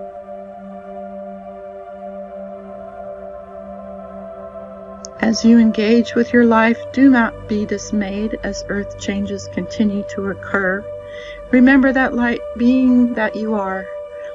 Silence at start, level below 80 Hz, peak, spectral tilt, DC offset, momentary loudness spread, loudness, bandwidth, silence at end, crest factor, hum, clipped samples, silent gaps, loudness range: 0 s; -44 dBFS; -2 dBFS; -5.5 dB/octave; under 0.1%; 21 LU; -16 LUFS; 7.6 kHz; 0 s; 16 dB; none; under 0.1%; none; 18 LU